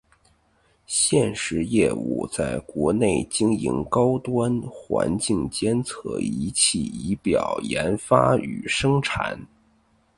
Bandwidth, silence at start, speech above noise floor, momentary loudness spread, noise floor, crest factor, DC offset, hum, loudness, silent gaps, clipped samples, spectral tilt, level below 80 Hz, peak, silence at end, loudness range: 11.5 kHz; 0.9 s; 40 dB; 8 LU; -63 dBFS; 22 dB; under 0.1%; none; -23 LUFS; none; under 0.1%; -4.5 dB/octave; -48 dBFS; -2 dBFS; 0.7 s; 2 LU